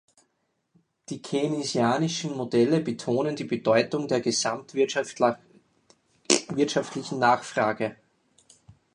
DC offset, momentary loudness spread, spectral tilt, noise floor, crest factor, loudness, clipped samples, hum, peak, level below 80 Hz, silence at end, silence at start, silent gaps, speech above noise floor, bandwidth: under 0.1%; 8 LU; -4 dB/octave; -75 dBFS; 24 dB; -26 LUFS; under 0.1%; none; -2 dBFS; -70 dBFS; 1 s; 1.1 s; none; 49 dB; 11 kHz